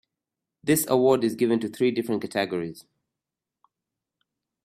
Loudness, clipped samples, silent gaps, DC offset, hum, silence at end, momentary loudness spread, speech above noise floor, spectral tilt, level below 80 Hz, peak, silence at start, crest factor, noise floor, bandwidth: -24 LUFS; under 0.1%; none; under 0.1%; none; 1.85 s; 11 LU; 64 dB; -5 dB/octave; -66 dBFS; -8 dBFS; 0.65 s; 18 dB; -88 dBFS; 15.5 kHz